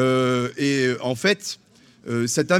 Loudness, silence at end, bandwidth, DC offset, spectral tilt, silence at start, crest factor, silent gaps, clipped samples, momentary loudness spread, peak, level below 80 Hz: -22 LUFS; 0 s; 16.5 kHz; under 0.1%; -4.5 dB/octave; 0 s; 18 dB; none; under 0.1%; 12 LU; -4 dBFS; -64 dBFS